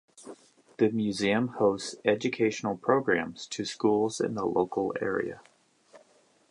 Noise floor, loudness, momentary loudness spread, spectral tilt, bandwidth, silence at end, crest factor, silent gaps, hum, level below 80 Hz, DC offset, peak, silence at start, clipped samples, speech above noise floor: -63 dBFS; -28 LUFS; 10 LU; -5 dB/octave; 11 kHz; 0.5 s; 22 dB; none; none; -66 dBFS; under 0.1%; -8 dBFS; 0.2 s; under 0.1%; 35 dB